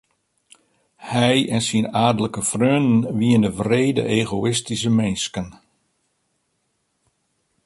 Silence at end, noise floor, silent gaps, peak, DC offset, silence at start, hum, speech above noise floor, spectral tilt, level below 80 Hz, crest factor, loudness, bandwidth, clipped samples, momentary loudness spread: 2.15 s; -71 dBFS; none; -2 dBFS; under 0.1%; 1 s; none; 52 dB; -5 dB/octave; -52 dBFS; 18 dB; -20 LUFS; 11.5 kHz; under 0.1%; 8 LU